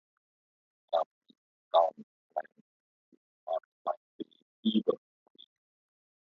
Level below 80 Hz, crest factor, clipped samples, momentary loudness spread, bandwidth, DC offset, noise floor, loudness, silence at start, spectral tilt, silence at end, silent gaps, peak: -90 dBFS; 24 dB; under 0.1%; 19 LU; 5.8 kHz; under 0.1%; under -90 dBFS; -33 LUFS; 0.9 s; -4.5 dB/octave; 1.35 s; 1.06-1.21 s, 1.38-1.71 s, 2.03-2.30 s, 2.61-3.47 s, 3.65-3.85 s, 3.97-4.19 s, 4.42-4.63 s; -12 dBFS